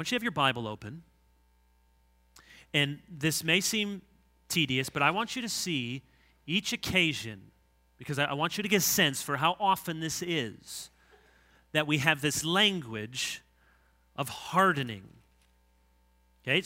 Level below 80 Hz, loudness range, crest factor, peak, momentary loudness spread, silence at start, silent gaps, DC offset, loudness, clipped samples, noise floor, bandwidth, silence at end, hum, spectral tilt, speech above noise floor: -64 dBFS; 4 LU; 24 dB; -6 dBFS; 17 LU; 0 s; none; under 0.1%; -29 LUFS; under 0.1%; -66 dBFS; 16 kHz; 0 s; none; -3 dB/octave; 36 dB